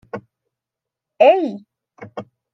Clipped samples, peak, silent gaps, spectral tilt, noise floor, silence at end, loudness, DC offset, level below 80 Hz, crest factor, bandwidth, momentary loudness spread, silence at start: under 0.1%; -2 dBFS; none; -6.5 dB/octave; -85 dBFS; 0.3 s; -15 LUFS; under 0.1%; -72 dBFS; 20 dB; 6.2 kHz; 22 LU; 0.15 s